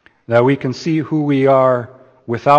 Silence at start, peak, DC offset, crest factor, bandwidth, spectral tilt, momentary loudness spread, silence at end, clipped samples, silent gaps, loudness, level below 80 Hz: 0.3 s; 0 dBFS; under 0.1%; 14 dB; 8.4 kHz; -7.5 dB/octave; 9 LU; 0 s; under 0.1%; none; -16 LUFS; -60 dBFS